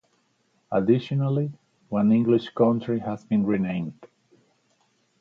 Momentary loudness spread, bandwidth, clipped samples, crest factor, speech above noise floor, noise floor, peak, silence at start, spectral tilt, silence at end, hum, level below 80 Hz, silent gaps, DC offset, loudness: 9 LU; 6.4 kHz; under 0.1%; 18 dB; 45 dB; -68 dBFS; -8 dBFS; 0.7 s; -9.5 dB/octave; 1.15 s; none; -62 dBFS; none; under 0.1%; -24 LUFS